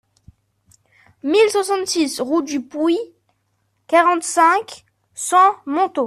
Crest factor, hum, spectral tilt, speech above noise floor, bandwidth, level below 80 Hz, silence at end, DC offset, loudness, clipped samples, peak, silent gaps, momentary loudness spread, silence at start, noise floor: 16 dB; none; -2 dB/octave; 51 dB; 14 kHz; -64 dBFS; 0 s; under 0.1%; -17 LUFS; under 0.1%; -2 dBFS; none; 13 LU; 1.25 s; -67 dBFS